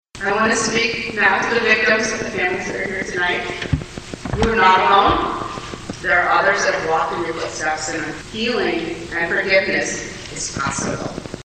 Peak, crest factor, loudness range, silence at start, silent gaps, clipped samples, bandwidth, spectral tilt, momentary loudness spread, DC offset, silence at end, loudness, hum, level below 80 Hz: 0 dBFS; 18 dB; 4 LU; 0.15 s; none; under 0.1%; 9.6 kHz; -3.5 dB/octave; 12 LU; under 0.1%; 0 s; -18 LUFS; none; -40 dBFS